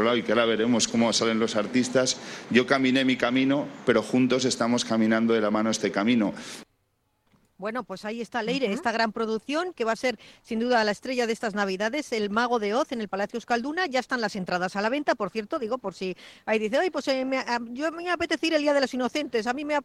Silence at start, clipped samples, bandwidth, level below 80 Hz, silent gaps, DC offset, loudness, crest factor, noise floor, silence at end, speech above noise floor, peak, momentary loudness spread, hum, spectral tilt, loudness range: 0 s; under 0.1%; 12.5 kHz; -64 dBFS; none; under 0.1%; -26 LUFS; 20 dB; -72 dBFS; 0 s; 47 dB; -6 dBFS; 8 LU; none; -4 dB/octave; 5 LU